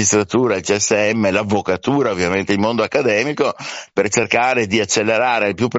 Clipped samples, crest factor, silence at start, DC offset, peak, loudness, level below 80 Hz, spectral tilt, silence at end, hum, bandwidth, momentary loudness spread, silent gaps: under 0.1%; 16 dB; 0 s; under 0.1%; -2 dBFS; -17 LUFS; -54 dBFS; -3.5 dB/octave; 0 s; none; 8.2 kHz; 4 LU; none